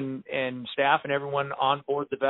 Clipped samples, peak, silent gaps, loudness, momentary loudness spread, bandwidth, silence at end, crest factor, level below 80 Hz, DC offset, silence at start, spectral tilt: under 0.1%; -8 dBFS; none; -27 LUFS; 7 LU; 4.1 kHz; 0 s; 20 dB; -70 dBFS; under 0.1%; 0 s; -2.5 dB/octave